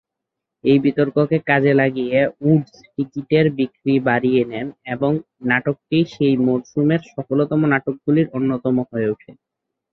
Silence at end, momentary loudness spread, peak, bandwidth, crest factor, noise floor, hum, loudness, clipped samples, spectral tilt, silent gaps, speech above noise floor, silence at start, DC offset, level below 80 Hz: 0.6 s; 8 LU; -2 dBFS; 6.2 kHz; 16 dB; -82 dBFS; none; -19 LUFS; under 0.1%; -8.5 dB/octave; none; 64 dB; 0.65 s; under 0.1%; -58 dBFS